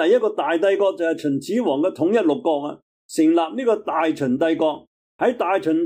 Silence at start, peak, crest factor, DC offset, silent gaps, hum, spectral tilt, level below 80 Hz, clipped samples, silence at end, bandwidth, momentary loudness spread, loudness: 0 s; -8 dBFS; 12 dB; under 0.1%; 2.82-3.09 s, 4.87-5.19 s; none; -5.5 dB/octave; -70 dBFS; under 0.1%; 0 s; 15 kHz; 5 LU; -20 LUFS